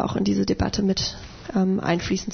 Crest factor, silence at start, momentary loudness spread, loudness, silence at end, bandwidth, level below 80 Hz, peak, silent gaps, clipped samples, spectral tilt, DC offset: 14 dB; 0 s; 6 LU; -24 LUFS; 0 s; 6.6 kHz; -40 dBFS; -10 dBFS; none; under 0.1%; -5.5 dB/octave; under 0.1%